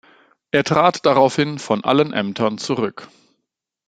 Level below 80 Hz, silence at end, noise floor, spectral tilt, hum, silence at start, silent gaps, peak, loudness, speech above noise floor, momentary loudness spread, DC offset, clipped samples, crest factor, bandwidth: -60 dBFS; 0.8 s; -78 dBFS; -5.5 dB/octave; none; 0.55 s; none; -2 dBFS; -18 LUFS; 60 dB; 7 LU; under 0.1%; under 0.1%; 18 dB; 9.4 kHz